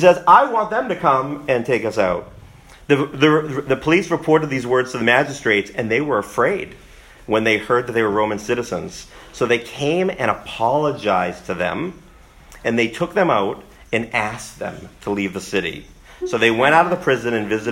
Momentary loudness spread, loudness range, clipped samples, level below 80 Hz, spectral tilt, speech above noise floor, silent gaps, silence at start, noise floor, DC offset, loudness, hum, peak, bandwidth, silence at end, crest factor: 12 LU; 4 LU; under 0.1%; -48 dBFS; -5 dB/octave; 26 dB; none; 0 s; -45 dBFS; under 0.1%; -19 LUFS; none; 0 dBFS; 16 kHz; 0 s; 18 dB